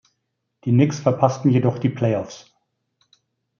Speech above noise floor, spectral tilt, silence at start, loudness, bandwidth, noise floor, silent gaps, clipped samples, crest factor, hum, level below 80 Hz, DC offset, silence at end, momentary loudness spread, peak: 57 dB; -8 dB/octave; 0.65 s; -20 LUFS; 7.2 kHz; -76 dBFS; none; under 0.1%; 18 dB; none; -64 dBFS; under 0.1%; 1.2 s; 14 LU; -2 dBFS